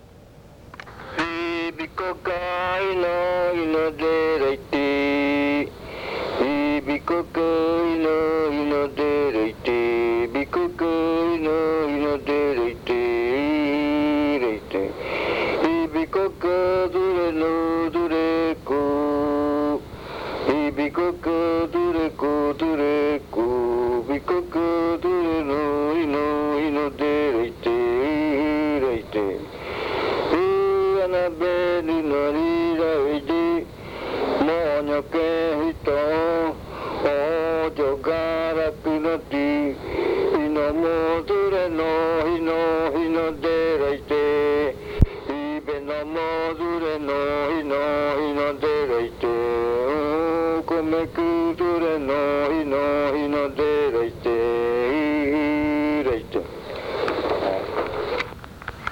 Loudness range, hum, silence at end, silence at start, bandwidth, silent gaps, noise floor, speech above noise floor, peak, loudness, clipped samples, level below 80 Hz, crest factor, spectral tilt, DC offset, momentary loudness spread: 2 LU; none; 0 s; 0.2 s; 17.5 kHz; none; -46 dBFS; 24 dB; 0 dBFS; -23 LUFS; under 0.1%; -42 dBFS; 22 dB; -7 dB/octave; under 0.1%; 6 LU